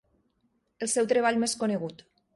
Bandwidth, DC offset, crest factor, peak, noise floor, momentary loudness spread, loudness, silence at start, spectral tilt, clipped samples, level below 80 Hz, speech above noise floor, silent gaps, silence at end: 11.5 kHz; under 0.1%; 18 dB; -12 dBFS; -73 dBFS; 11 LU; -27 LUFS; 0.8 s; -3.5 dB/octave; under 0.1%; -70 dBFS; 46 dB; none; 0.4 s